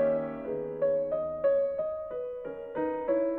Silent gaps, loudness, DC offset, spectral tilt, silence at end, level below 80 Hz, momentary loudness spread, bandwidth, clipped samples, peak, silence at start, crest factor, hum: none; -31 LUFS; under 0.1%; -10 dB/octave; 0 s; -62 dBFS; 9 LU; 3.6 kHz; under 0.1%; -16 dBFS; 0 s; 14 dB; none